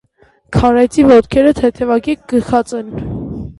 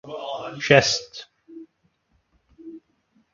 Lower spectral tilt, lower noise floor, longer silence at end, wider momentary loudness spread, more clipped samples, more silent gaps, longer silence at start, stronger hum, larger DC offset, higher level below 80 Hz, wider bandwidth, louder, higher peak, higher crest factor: first, -7 dB/octave vs -3.5 dB/octave; second, -52 dBFS vs -68 dBFS; second, 0.05 s vs 0.55 s; second, 15 LU vs 28 LU; neither; neither; first, 0.5 s vs 0.05 s; neither; neither; first, -32 dBFS vs -60 dBFS; first, 11.5 kHz vs 7.4 kHz; first, -12 LUFS vs -21 LUFS; about the same, 0 dBFS vs 0 dBFS; second, 12 dB vs 26 dB